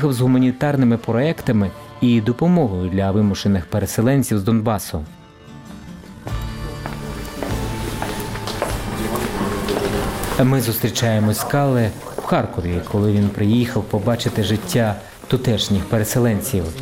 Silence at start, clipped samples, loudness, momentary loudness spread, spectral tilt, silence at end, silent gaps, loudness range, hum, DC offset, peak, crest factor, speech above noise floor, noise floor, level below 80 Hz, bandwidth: 0 s; under 0.1%; -20 LUFS; 12 LU; -6 dB/octave; 0 s; none; 8 LU; none; 0.2%; -4 dBFS; 16 dB; 22 dB; -40 dBFS; -36 dBFS; 17 kHz